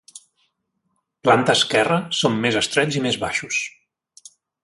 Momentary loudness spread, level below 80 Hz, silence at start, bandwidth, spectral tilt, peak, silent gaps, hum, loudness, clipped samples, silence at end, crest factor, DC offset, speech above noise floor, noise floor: 8 LU; -58 dBFS; 0.15 s; 11.5 kHz; -3.5 dB/octave; -2 dBFS; none; none; -19 LUFS; under 0.1%; 0.95 s; 20 dB; under 0.1%; 53 dB; -72 dBFS